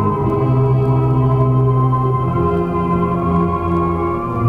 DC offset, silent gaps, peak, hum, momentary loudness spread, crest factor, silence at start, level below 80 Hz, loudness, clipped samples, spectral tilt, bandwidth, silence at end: under 0.1%; none; -4 dBFS; none; 3 LU; 10 dB; 0 s; -32 dBFS; -16 LUFS; under 0.1%; -11 dB/octave; 3.5 kHz; 0 s